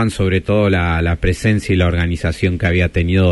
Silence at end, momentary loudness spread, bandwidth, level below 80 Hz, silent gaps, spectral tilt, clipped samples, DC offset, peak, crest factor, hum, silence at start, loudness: 0 s; 3 LU; 11.5 kHz; -28 dBFS; none; -7 dB/octave; under 0.1%; under 0.1%; -2 dBFS; 14 dB; none; 0 s; -16 LUFS